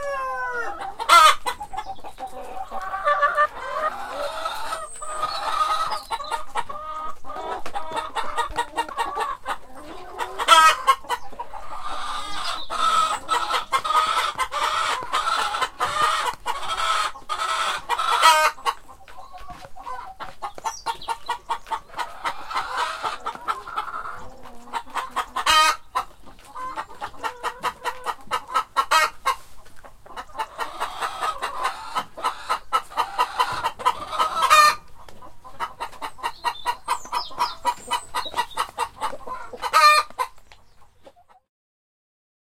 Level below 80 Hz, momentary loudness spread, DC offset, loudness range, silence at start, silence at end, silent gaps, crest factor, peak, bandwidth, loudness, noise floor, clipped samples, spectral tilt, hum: -50 dBFS; 18 LU; under 0.1%; 8 LU; 0 s; 1.35 s; none; 24 dB; 0 dBFS; 16.5 kHz; -23 LUFS; -51 dBFS; under 0.1%; 0 dB/octave; none